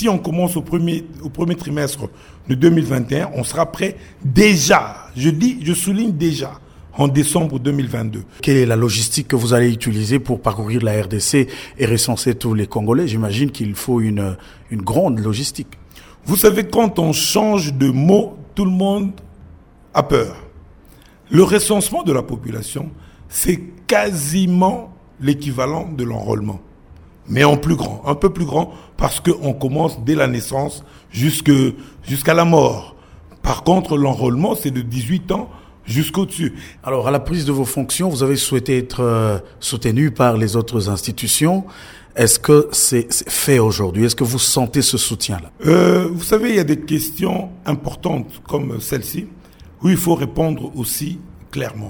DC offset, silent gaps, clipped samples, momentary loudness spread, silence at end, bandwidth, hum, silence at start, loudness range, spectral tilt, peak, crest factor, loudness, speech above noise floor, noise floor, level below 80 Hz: under 0.1%; none; under 0.1%; 12 LU; 0 s; over 20 kHz; none; 0 s; 5 LU; -5 dB/octave; 0 dBFS; 18 dB; -17 LUFS; 28 dB; -45 dBFS; -40 dBFS